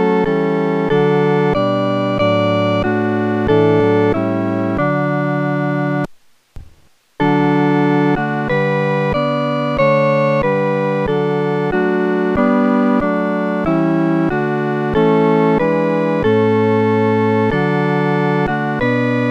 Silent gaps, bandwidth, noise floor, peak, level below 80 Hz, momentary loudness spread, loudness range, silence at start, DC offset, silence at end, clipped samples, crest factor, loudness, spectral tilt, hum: none; 8.6 kHz; -49 dBFS; -2 dBFS; -42 dBFS; 4 LU; 3 LU; 0 s; under 0.1%; 0 s; under 0.1%; 14 dB; -15 LUFS; -8.5 dB/octave; none